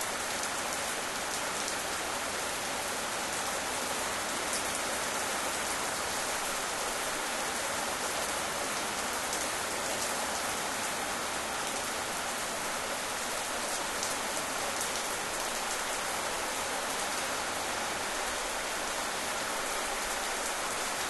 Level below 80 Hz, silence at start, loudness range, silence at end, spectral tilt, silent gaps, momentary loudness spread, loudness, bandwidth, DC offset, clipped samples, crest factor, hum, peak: -58 dBFS; 0 s; 1 LU; 0 s; -0.5 dB/octave; none; 1 LU; -32 LUFS; 12.5 kHz; under 0.1%; under 0.1%; 20 dB; none; -14 dBFS